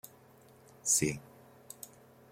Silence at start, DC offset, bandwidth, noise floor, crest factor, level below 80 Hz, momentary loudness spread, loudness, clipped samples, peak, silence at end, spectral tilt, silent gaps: 0.85 s; under 0.1%; 16.5 kHz; -60 dBFS; 24 dB; -66 dBFS; 23 LU; -30 LUFS; under 0.1%; -16 dBFS; 0.45 s; -3 dB/octave; none